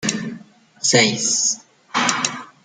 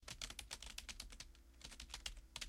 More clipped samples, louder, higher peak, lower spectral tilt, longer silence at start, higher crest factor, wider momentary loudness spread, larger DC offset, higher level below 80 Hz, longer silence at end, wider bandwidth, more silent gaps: neither; first, -18 LUFS vs -52 LUFS; first, 0 dBFS vs -28 dBFS; about the same, -2 dB/octave vs -1 dB/octave; about the same, 0 s vs 0 s; about the same, 20 dB vs 24 dB; first, 14 LU vs 8 LU; neither; about the same, -64 dBFS vs -60 dBFS; first, 0.2 s vs 0 s; second, 11 kHz vs 16.5 kHz; neither